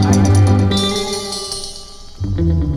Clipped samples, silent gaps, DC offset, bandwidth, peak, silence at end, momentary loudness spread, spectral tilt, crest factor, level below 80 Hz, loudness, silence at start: under 0.1%; none; under 0.1%; 13 kHz; 0 dBFS; 0 s; 17 LU; -5.5 dB/octave; 14 dB; -28 dBFS; -16 LUFS; 0 s